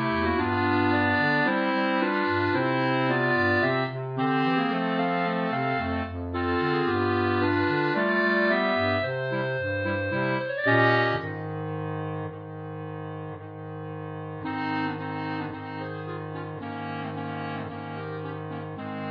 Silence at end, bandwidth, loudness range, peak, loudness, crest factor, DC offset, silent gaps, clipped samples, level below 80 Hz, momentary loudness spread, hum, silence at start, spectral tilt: 0 s; 5.2 kHz; 10 LU; -8 dBFS; -26 LUFS; 18 dB; under 0.1%; none; under 0.1%; -56 dBFS; 13 LU; none; 0 s; -8.5 dB/octave